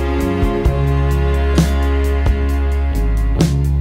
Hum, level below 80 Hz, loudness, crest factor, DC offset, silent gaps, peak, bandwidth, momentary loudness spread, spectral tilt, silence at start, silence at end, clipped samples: none; -16 dBFS; -17 LUFS; 14 dB; under 0.1%; none; 0 dBFS; 15.5 kHz; 3 LU; -7 dB/octave; 0 s; 0 s; under 0.1%